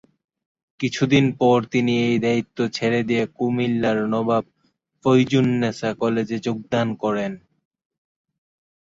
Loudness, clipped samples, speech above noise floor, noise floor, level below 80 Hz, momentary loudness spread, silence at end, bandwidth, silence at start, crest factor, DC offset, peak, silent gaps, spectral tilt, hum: -21 LUFS; under 0.1%; 48 dB; -68 dBFS; -58 dBFS; 8 LU; 1.45 s; 7.8 kHz; 0.8 s; 18 dB; under 0.1%; -4 dBFS; none; -6.5 dB/octave; none